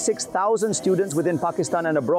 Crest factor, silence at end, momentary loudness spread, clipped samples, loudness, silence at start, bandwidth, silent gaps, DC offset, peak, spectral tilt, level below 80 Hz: 10 dB; 0 s; 2 LU; under 0.1%; -22 LUFS; 0 s; 16 kHz; none; under 0.1%; -12 dBFS; -4.5 dB/octave; -66 dBFS